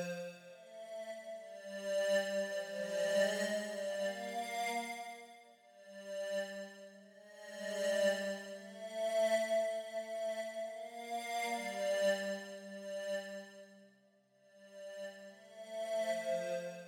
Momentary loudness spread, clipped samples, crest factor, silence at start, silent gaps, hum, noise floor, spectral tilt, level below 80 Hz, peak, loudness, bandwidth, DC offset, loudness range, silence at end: 20 LU; under 0.1%; 18 dB; 0 s; none; none; -70 dBFS; -3 dB/octave; under -90 dBFS; -22 dBFS; -39 LUFS; 18.5 kHz; under 0.1%; 8 LU; 0 s